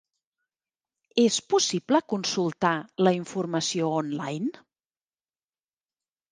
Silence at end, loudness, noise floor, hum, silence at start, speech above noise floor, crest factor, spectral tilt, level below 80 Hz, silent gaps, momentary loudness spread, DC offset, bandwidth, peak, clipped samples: 1.8 s; -26 LUFS; under -90 dBFS; none; 1.15 s; over 65 dB; 20 dB; -4 dB/octave; -74 dBFS; none; 8 LU; under 0.1%; 10 kHz; -8 dBFS; under 0.1%